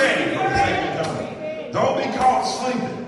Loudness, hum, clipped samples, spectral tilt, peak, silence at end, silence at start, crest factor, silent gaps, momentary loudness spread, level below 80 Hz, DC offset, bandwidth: -21 LUFS; none; under 0.1%; -4.5 dB/octave; -4 dBFS; 0 s; 0 s; 16 dB; none; 9 LU; -48 dBFS; under 0.1%; 11.5 kHz